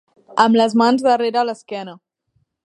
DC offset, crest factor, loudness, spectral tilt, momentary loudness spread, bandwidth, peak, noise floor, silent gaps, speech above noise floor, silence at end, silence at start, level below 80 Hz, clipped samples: under 0.1%; 18 dB; -16 LUFS; -5 dB/octave; 16 LU; 10.5 kHz; 0 dBFS; -67 dBFS; none; 51 dB; 0.7 s; 0.35 s; -70 dBFS; under 0.1%